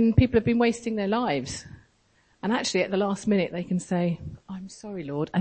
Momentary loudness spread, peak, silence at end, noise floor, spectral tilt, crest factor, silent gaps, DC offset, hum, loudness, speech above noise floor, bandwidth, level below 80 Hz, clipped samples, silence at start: 16 LU; -6 dBFS; 0 s; -64 dBFS; -6 dB/octave; 20 dB; none; under 0.1%; none; -26 LUFS; 39 dB; 8.8 kHz; -44 dBFS; under 0.1%; 0 s